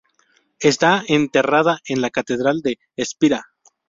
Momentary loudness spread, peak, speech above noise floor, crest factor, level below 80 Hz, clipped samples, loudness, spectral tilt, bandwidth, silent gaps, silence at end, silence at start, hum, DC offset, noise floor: 10 LU; -2 dBFS; 43 dB; 18 dB; -58 dBFS; under 0.1%; -19 LUFS; -4.5 dB/octave; 7.8 kHz; none; 0.45 s; 0.6 s; none; under 0.1%; -61 dBFS